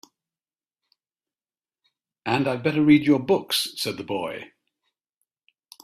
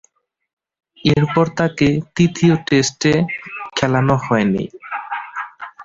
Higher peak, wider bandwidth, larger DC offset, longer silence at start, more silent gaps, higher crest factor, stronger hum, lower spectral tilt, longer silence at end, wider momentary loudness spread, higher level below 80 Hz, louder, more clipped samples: about the same, -4 dBFS vs -2 dBFS; first, 15 kHz vs 7.8 kHz; neither; first, 2.25 s vs 1.05 s; neither; first, 22 dB vs 16 dB; neither; about the same, -5 dB/octave vs -5.5 dB/octave; first, 1.4 s vs 0 s; about the same, 14 LU vs 12 LU; second, -62 dBFS vs -48 dBFS; second, -22 LUFS vs -17 LUFS; neither